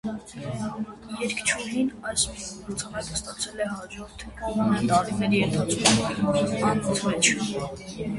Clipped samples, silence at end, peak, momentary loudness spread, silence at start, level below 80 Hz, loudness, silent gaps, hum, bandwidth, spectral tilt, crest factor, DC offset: under 0.1%; 0 s; -2 dBFS; 14 LU; 0.05 s; -50 dBFS; -25 LUFS; none; none; 11.5 kHz; -3.5 dB/octave; 24 dB; under 0.1%